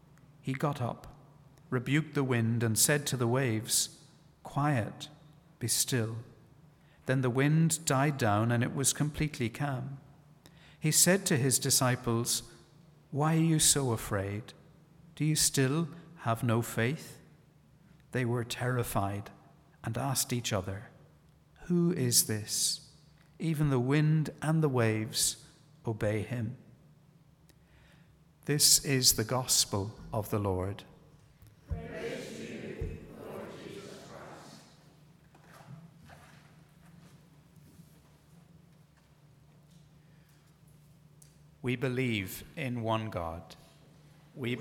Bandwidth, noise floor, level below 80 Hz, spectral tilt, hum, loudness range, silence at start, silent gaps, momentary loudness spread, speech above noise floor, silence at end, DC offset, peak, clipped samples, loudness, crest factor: 18 kHz; -61 dBFS; -58 dBFS; -4 dB/octave; none; 12 LU; 0.45 s; none; 19 LU; 31 dB; 0 s; under 0.1%; -10 dBFS; under 0.1%; -30 LUFS; 22 dB